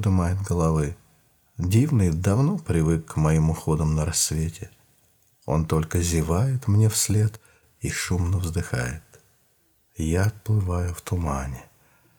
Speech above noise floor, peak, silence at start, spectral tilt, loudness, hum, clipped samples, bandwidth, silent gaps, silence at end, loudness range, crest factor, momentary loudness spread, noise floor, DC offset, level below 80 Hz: 42 dB; -8 dBFS; 0 s; -5.5 dB/octave; -24 LUFS; none; under 0.1%; 19.5 kHz; none; 0.55 s; 5 LU; 16 dB; 11 LU; -64 dBFS; under 0.1%; -38 dBFS